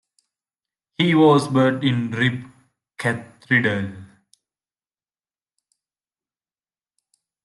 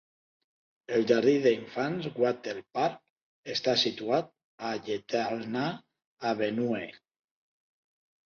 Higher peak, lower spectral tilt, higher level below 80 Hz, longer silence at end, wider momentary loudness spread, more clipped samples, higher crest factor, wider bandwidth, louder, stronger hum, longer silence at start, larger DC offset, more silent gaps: first, -4 dBFS vs -10 dBFS; first, -6.5 dB/octave vs -5 dB/octave; first, -66 dBFS vs -72 dBFS; first, 3.4 s vs 1.3 s; first, 16 LU vs 12 LU; neither; about the same, 20 dB vs 22 dB; first, 12 kHz vs 7 kHz; first, -19 LUFS vs -30 LUFS; neither; about the same, 1 s vs 0.9 s; neither; second, none vs 3.10-3.16 s, 3.22-3.43 s, 4.44-4.58 s, 6.05-6.17 s